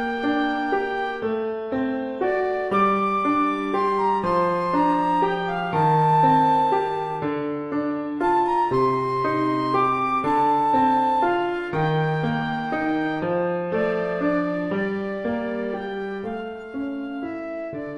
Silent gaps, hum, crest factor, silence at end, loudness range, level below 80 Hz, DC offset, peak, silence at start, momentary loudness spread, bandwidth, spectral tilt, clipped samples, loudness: none; none; 14 dB; 0 s; 5 LU; -54 dBFS; under 0.1%; -8 dBFS; 0 s; 10 LU; 11.5 kHz; -7.5 dB/octave; under 0.1%; -23 LUFS